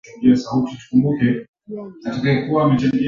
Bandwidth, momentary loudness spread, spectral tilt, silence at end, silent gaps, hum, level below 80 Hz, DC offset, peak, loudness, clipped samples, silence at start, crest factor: 7.4 kHz; 15 LU; -8 dB/octave; 0 s; 1.48-1.53 s; none; -52 dBFS; under 0.1%; -4 dBFS; -18 LUFS; under 0.1%; 0.05 s; 16 dB